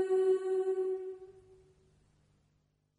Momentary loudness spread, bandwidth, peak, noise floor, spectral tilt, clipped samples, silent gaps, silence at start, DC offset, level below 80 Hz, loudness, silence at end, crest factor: 16 LU; 10.5 kHz; -20 dBFS; -75 dBFS; -6 dB/octave; under 0.1%; none; 0 s; under 0.1%; -76 dBFS; -32 LUFS; 1.65 s; 14 dB